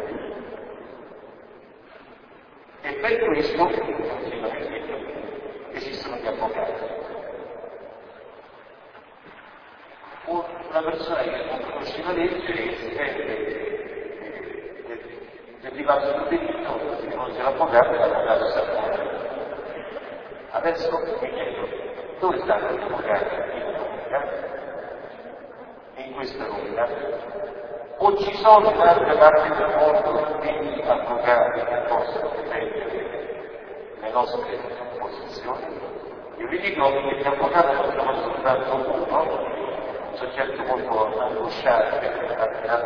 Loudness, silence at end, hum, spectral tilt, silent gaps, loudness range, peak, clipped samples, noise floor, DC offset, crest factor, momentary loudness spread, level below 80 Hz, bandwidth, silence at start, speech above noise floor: -24 LUFS; 0 s; none; -6.5 dB/octave; none; 13 LU; 0 dBFS; under 0.1%; -48 dBFS; under 0.1%; 24 dB; 18 LU; -54 dBFS; 5.4 kHz; 0 s; 26 dB